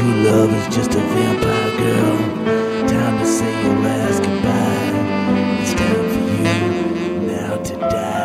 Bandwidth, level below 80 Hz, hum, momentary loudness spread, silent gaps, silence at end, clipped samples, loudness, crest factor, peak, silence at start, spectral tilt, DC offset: 15.5 kHz; -42 dBFS; none; 5 LU; none; 0 s; under 0.1%; -17 LUFS; 14 dB; -2 dBFS; 0 s; -6 dB/octave; under 0.1%